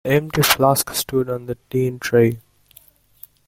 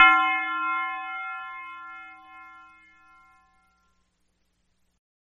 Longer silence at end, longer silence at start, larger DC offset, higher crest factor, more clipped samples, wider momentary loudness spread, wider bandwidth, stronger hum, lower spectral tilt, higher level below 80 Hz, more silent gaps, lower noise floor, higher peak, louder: second, 1.1 s vs 2.85 s; about the same, 0.05 s vs 0 s; neither; second, 18 dB vs 24 dB; neither; second, 10 LU vs 24 LU; first, 17 kHz vs 8.6 kHz; first, 50 Hz at -60 dBFS vs none; first, -4.5 dB/octave vs -1.5 dB/octave; first, -50 dBFS vs -68 dBFS; neither; second, -52 dBFS vs -71 dBFS; about the same, -2 dBFS vs -4 dBFS; first, -19 LUFS vs -25 LUFS